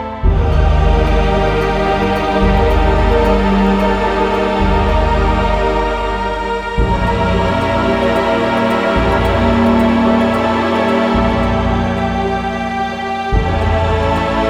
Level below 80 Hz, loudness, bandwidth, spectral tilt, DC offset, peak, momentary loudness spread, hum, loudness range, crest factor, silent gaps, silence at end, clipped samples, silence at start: -20 dBFS; -14 LUFS; 11 kHz; -7 dB/octave; under 0.1%; 0 dBFS; 5 LU; none; 2 LU; 12 dB; none; 0 s; under 0.1%; 0 s